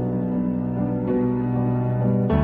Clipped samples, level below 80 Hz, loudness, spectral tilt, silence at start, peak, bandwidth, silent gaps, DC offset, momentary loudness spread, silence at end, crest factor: under 0.1%; -38 dBFS; -23 LUFS; -12 dB/octave; 0 s; -6 dBFS; 3.6 kHz; none; under 0.1%; 3 LU; 0 s; 14 dB